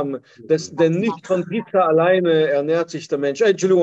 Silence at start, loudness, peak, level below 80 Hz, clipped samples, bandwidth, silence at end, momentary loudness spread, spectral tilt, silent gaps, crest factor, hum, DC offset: 0 s; -19 LUFS; -4 dBFS; -66 dBFS; under 0.1%; 8.2 kHz; 0 s; 7 LU; -6 dB/octave; none; 14 dB; none; under 0.1%